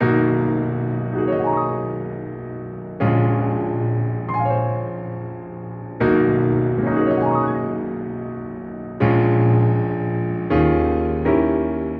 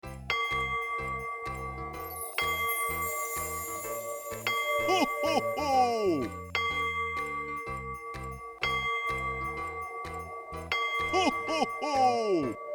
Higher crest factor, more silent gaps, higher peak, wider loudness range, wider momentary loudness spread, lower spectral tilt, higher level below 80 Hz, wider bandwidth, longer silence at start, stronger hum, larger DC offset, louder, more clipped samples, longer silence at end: about the same, 14 dB vs 18 dB; neither; first, -4 dBFS vs -14 dBFS; about the same, 3 LU vs 4 LU; first, 15 LU vs 11 LU; first, -11.5 dB/octave vs -3.5 dB/octave; first, -38 dBFS vs -52 dBFS; second, 4.4 kHz vs over 20 kHz; about the same, 0 s vs 0.05 s; neither; neither; first, -20 LUFS vs -31 LUFS; neither; about the same, 0 s vs 0 s